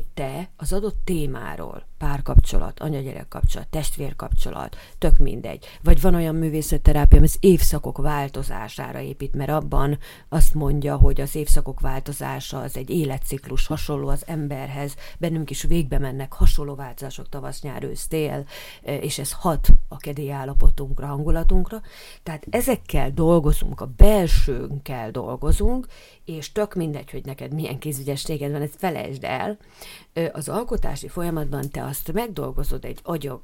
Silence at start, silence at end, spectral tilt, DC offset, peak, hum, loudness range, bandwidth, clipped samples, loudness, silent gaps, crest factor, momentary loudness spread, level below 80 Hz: 0 s; 0.05 s; -6 dB/octave; under 0.1%; 0 dBFS; none; 8 LU; 16.5 kHz; under 0.1%; -25 LUFS; none; 18 dB; 13 LU; -20 dBFS